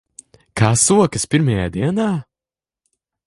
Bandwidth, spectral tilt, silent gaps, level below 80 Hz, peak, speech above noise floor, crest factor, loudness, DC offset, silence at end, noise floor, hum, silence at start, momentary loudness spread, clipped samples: 11.5 kHz; -5 dB/octave; none; -42 dBFS; 0 dBFS; over 74 dB; 18 dB; -17 LUFS; under 0.1%; 1.05 s; under -90 dBFS; none; 0.55 s; 9 LU; under 0.1%